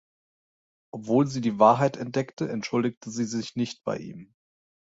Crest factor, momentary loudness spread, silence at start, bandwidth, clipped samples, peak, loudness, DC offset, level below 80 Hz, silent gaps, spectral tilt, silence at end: 22 dB; 15 LU; 0.95 s; 8 kHz; under 0.1%; -4 dBFS; -26 LUFS; under 0.1%; -68 dBFS; 2.33-2.37 s, 2.97-3.01 s; -6 dB/octave; 0.7 s